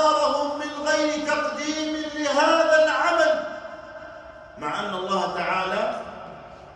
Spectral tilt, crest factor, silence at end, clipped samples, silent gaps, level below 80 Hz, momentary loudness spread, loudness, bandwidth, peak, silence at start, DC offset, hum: -3 dB/octave; 16 dB; 0 s; under 0.1%; none; -58 dBFS; 21 LU; -23 LUFS; 11 kHz; -6 dBFS; 0 s; under 0.1%; none